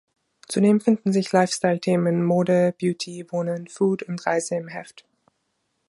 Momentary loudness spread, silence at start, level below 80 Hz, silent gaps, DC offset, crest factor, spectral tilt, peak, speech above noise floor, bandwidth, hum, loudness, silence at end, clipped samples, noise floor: 10 LU; 0.5 s; -68 dBFS; none; under 0.1%; 18 dB; -6 dB/octave; -4 dBFS; 52 dB; 11.5 kHz; none; -22 LUFS; 1 s; under 0.1%; -74 dBFS